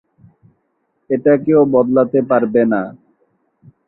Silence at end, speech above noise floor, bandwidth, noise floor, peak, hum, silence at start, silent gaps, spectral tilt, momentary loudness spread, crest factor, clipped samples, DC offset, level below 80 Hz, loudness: 0.95 s; 53 dB; 4 kHz; -67 dBFS; -2 dBFS; none; 1.1 s; none; -13 dB/octave; 9 LU; 14 dB; under 0.1%; under 0.1%; -58 dBFS; -14 LUFS